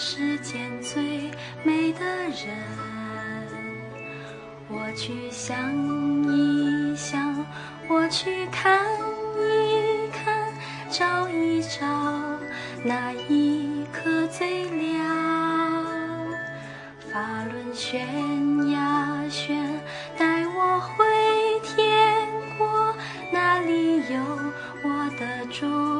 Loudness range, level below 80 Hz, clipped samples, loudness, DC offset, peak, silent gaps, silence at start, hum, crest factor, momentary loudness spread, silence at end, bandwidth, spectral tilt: 7 LU; -64 dBFS; under 0.1%; -25 LUFS; under 0.1%; -6 dBFS; none; 0 s; none; 20 dB; 12 LU; 0 s; 10.5 kHz; -4.5 dB/octave